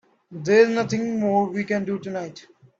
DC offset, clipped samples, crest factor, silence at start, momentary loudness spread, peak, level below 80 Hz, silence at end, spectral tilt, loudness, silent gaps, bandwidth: under 0.1%; under 0.1%; 20 dB; 0.3 s; 15 LU; -4 dBFS; -66 dBFS; 0.4 s; -6 dB/octave; -22 LUFS; none; 7.8 kHz